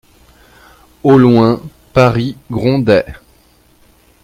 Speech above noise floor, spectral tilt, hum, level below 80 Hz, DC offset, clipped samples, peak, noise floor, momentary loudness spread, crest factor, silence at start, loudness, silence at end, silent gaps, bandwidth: 39 dB; -8 dB/octave; none; -42 dBFS; under 0.1%; under 0.1%; 0 dBFS; -49 dBFS; 12 LU; 14 dB; 1.05 s; -12 LUFS; 1.1 s; none; 15 kHz